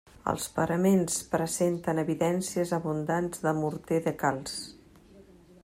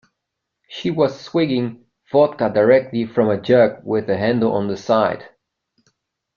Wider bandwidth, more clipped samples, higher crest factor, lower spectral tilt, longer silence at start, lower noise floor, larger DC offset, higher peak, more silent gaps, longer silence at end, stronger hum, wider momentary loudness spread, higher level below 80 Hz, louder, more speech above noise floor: first, 16 kHz vs 7 kHz; neither; about the same, 18 dB vs 16 dB; second, -5.5 dB/octave vs -7.5 dB/octave; second, 0.25 s vs 0.7 s; second, -54 dBFS vs -79 dBFS; neither; second, -12 dBFS vs -2 dBFS; neither; second, 0.4 s vs 1.1 s; neither; about the same, 8 LU vs 9 LU; about the same, -60 dBFS vs -58 dBFS; second, -29 LUFS vs -18 LUFS; second, 26 dB vs 62 dB